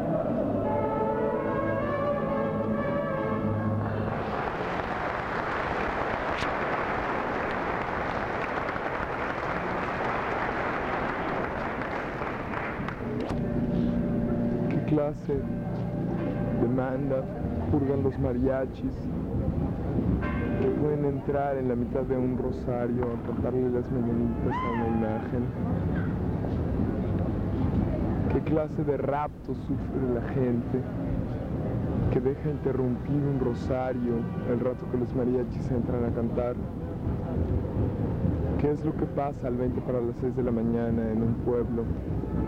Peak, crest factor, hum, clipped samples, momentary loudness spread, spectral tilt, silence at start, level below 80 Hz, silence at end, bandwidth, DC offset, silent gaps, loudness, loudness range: -12 dBFS; 16 dB; none; under 0.1%; 4 LU; -9 dB/octave; 0 s; -40 dBFS; 0 s; 8.4 kHz; under 0.1%; none; -29 LUFS; 2 LU